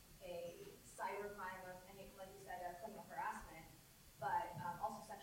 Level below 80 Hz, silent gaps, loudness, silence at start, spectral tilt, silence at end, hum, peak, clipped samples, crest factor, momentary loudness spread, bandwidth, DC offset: -70 dBFS; none; -49 LUFS; 0 s; -4 dB/octave; 0 s; none; -30 dBFS; under 0.1%; 18 dB; 14 LU; 16 kHz; under 0.1%